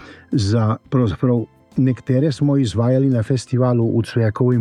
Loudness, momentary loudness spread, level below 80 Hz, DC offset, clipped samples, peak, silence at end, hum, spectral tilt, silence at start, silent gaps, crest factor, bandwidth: -18 LUFS; 4 LU; -48 dBFS; under 0.1%; under 0.1%; -4 dBFS; 0 s; none; -8 dB/octave; 0 s; none; 12 dB; 10.5 kHz